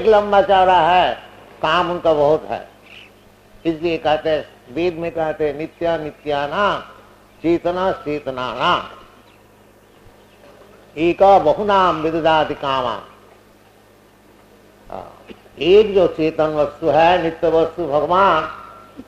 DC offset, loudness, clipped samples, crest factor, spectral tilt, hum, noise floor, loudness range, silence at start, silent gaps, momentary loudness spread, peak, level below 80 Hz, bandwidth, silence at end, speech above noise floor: under 0.1%; -17 LUFS; under 0.1%; 16 dB; -6 dB/octave; none; -49 dBFS; 6 LU; 0 s; none; 16 LU; -2 dBFS; -46 dBFS; 10.5 kHz; 0.05 s; 33 dB